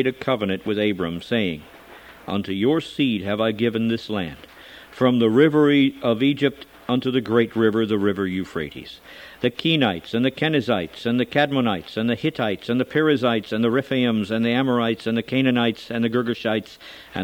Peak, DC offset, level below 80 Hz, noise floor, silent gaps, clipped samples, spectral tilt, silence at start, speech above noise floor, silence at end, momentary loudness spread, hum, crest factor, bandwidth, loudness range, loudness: -4 dBFS; under 0.1%; -58 dBFS; -44 dBFS; none; under 0.1%; -7 dB/octave; 0 s; 23 dB; 0 s; 11 LU; none; 18 dB; 17 kHz; 4 LU; -21 LUFS